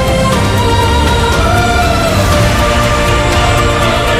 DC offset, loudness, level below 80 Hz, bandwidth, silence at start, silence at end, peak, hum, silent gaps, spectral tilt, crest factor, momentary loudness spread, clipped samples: under 0.1%; -10 LUFS; -18 dBFS; 16 kHz; 0 s; 0 s; 0 dBFS; none; none; -5 dB/octave; 10 dB; 1 LU; under 0.1%